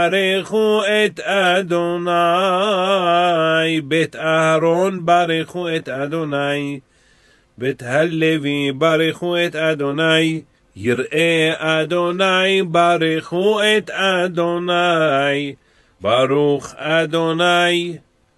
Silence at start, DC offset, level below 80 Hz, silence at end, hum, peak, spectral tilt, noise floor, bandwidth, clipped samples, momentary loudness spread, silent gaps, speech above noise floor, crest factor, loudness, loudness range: 0 s; under 0.1%; -62 dBFS; 0.4 s; none; -2 dBFS; -5 dB/octave; -54 dBFS; 12.5 kHz; under 0.1%; 7 LU; none; 37 dB; 16 dB; -17 LUFS; 4 LU